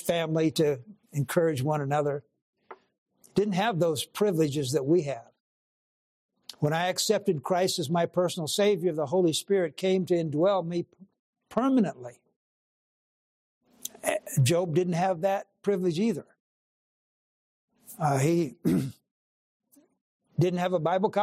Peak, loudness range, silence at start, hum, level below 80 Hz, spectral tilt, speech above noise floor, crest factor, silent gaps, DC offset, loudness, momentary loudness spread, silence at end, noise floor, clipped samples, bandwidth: -10 dBFS; 5 LU; 0 s; none; -70 dBFS; -5.5 dB/octave; over 64 dB; 18 dB; 2.42-2.53 s, 2.98-3.06 s, 5.40-6.29 s, 11.19-11.33 s, 12.36-13.61 s, 16.40-17.68 s, 19.11-19.60 s, 20.01-20.20 s; under 0.1%; -27 LUFS; 10 LU; 0 s; under -90 dBFS; under 0.1%; 15 kHz